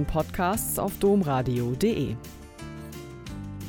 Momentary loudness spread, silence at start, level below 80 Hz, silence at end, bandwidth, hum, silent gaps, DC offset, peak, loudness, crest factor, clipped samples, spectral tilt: 17 LU; 0 s; -42 dBFS; 0 s; 18 kHz; none; none; under 0.1%; -12 dBFS; -26 LUFS; 16 dB; under 0.1%; -6 dB/octave